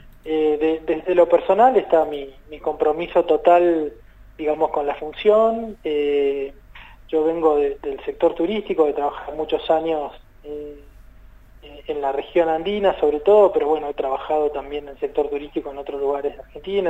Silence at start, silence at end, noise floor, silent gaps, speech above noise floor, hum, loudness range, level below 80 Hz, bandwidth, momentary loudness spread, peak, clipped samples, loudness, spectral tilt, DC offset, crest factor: 0.05 s; 0 s; -45 dBFS; none; 25 dB; none; 6 LU; -48 dBFS; 7.8 kHz; 14 LU; -2 dBFS; under 0.1%; -20 LUFS; -7 dB/octave; under 0.1%; 18 dB